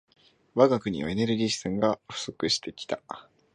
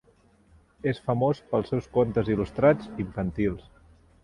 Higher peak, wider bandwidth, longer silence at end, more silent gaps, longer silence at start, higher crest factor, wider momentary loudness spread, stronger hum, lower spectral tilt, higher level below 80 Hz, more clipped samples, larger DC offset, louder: first, -4 dBFS vs -8 dBFS; about the same, 11 kHz vs 11 kHz; second, 0.3 s vs 0.65 s; neither; second, 0.55 s vs 0.85 s; about the same, 24 dB vs 20 dB; first, 13 LU vs 9 LU; neither; second, -4.5 dB/octave vs -9 dB/octave; second, -58 dBFS vs -48 dBFS; neither; neither; about the same, -27 LUFS vs -26 LUFS